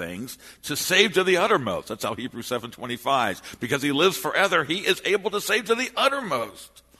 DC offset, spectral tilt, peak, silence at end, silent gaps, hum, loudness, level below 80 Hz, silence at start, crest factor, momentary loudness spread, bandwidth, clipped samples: under 0.1%; -3 dB/octave; -2 dBFS; 0.35 s; none; none; -23 LUFS; -62 dBFS; 0 s; 22 dB; 13 LU; 13.5 kHz; under 0.1%